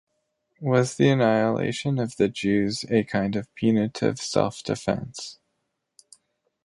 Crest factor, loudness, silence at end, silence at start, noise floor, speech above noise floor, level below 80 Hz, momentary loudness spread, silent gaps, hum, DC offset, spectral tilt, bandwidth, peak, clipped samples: 20 dB; -24 LUFS; 1.3 s; 0.6 s; -77 dBFS; 54 dB; -58 dBFS; 9 LU; none; none; under 0.1%; -6 dB/octave; 11.5 kHz; -6 dBFS; under 0.1%